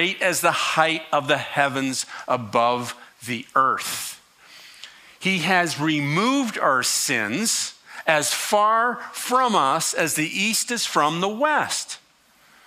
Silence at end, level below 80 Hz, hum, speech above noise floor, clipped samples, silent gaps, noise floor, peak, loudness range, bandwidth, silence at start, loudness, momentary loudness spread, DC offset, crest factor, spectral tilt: 0.7 s; -72 dBFS; none; 35 dB; under 0.1%; none; -57 dBFS; -4 dBFS; 4 LU; 15.5 kHz; 0 s; -21 LUFS; 10 LU; under 0.1%; 20 dB; -2.5 dB/octave